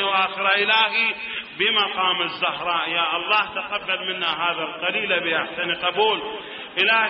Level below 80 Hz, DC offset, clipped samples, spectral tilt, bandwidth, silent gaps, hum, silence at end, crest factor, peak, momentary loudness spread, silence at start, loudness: -66 dBFS; under 0.1%; under 0.1%; 1.5 dB/octave; 5.8 kHz; none; none; 0 s; 16 dB; -6 dBFS; 8 LU; 0 s; -21 LUFS